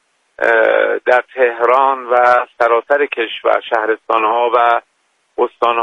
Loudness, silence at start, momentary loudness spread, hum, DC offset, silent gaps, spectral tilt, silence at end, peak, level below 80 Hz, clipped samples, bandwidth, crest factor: -14 LUFS; 0.4 s; 6 LU; none; under 0.1%; none; -3.5 dB/octave; 0 s; 0 dBFS; -64 dBFS; under 0.1%; 8 kHz; 14 dB